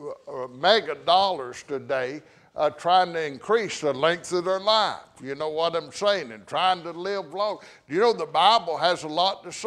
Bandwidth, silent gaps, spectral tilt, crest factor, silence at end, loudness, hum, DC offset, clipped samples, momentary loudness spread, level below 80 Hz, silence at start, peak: 11.5 kHz; none; -3 dB/octave; 20 dB; 0 s; -24 LUFS; none; under 0.1%; under 0.1%; 12 LU; -68 dBFS; 0 s; -4 dBFS